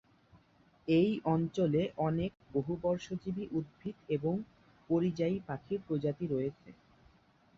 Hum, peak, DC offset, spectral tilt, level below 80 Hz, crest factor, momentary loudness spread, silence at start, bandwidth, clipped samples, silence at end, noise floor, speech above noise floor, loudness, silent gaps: none; -18 dBFS; under 0.1%; -8.5 dB/octave; -64 dBFS; 18 dB; 9 LU; 0.35 s; 7.4 kHz; under 0.1%; 0.85 s; -66 dBFS; 33 dB; -34 LUFS; none